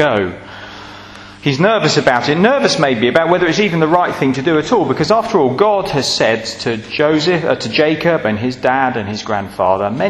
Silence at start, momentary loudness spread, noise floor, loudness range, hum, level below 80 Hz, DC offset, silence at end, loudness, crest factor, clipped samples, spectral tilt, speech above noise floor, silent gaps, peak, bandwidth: 0 s; 9 LU; -35 dBFS; 2 LU; none; -48 dBFS; under 0.1%; 0 s; -14 LUFS; 14 dB; under 0.1%; -5 dB/octave; 21 dB; none; 0 dBFS; 13.5 kHz